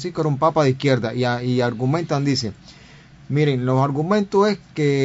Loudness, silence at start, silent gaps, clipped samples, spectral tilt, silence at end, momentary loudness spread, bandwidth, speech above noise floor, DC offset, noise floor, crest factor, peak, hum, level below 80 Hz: -20 LUFS; 0 s; none; under 0.1%; -6.5 dB/octave; 0 s; 5 LU; 7.8 kHz; 26 dB; under 0.1%; -45 dBFS; 16 dB; -4 dBFS; none; -54 dBFS